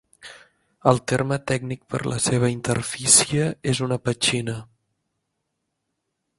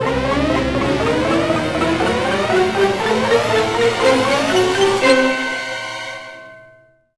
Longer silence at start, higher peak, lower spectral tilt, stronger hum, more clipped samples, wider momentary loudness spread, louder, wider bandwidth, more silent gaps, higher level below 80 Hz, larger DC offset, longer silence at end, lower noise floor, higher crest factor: first, 0.25 s vs 0 s; about the same, 0 dBFS vs 0 dBFS; about the same, -3.5 dB/octave vs -4.5 dB/octave; neither; neither; about the same, 12 LU vs 10 LU; second, -21 LUFS vs -16 LUFS; about the same, 11.5 kHz vs 11 kHz; neither; second, -54 dBFS vs -38 dBFS; second, under 0.1% vs 0.5%; first, 1.75 s vs 0.55 s; first, -78 dBFS vs -49 dBFS; first, 24 dB vs 16 dB